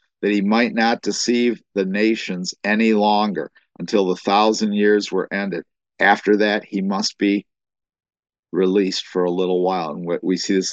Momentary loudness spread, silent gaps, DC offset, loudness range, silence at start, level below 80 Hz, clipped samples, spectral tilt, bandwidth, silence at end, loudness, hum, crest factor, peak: 8 LU; 8.19-8.23 s, 8.39-8.43 s; under 0.1%; 3 LU; 0.2 s; -70 dBFS; under 0.1%; -4.5 dB/octave; 8.4 kHz; 0 s; -19 LUFS; none; 20 dB; 0 dBFS